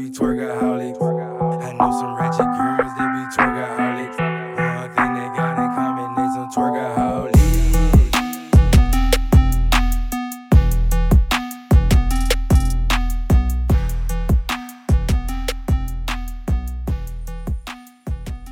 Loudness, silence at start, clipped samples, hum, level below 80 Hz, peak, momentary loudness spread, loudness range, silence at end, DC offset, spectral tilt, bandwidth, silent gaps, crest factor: -19 LUFS; 0 s; under 0.1%; none; -20 dBFS; 0 dBFS; 11 LU; 6 LU; 0 s; under 0.1%; -6 dB/octave; 17.5 kHz; none; 16 dB